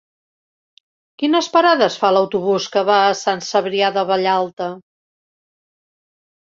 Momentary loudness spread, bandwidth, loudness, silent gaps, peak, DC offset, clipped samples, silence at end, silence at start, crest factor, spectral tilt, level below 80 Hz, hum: 9 LU; 7.8 kHz; -17 LUFS; 4.53-4.57 s; -2 dBFS; under 0.1%; under 0.1%; 1.7 s; 1.2 s; 18 dB; -4 dB/octave; -66 dBFS; none